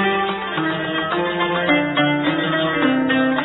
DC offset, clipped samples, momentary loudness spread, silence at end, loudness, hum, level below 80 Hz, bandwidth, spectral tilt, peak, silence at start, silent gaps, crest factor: under 0.1%; under 0.1%; 5 LU; 0 s; -19 LUFS; none; -52 dBFS; 4.1 kHz; -9 dB/octave; -4 dBFS; 0 s; none; 14 dB